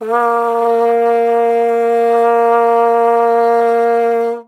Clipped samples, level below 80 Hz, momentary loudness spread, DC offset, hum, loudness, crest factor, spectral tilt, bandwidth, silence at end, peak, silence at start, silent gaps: under 0.1%; -80 dBFS; 3 LU; under 0.1%; none; -12 LUFS; 12 dB; -5 dB/octave; 11 kHz; 0.05 s; 0 dBFS; 0 s; none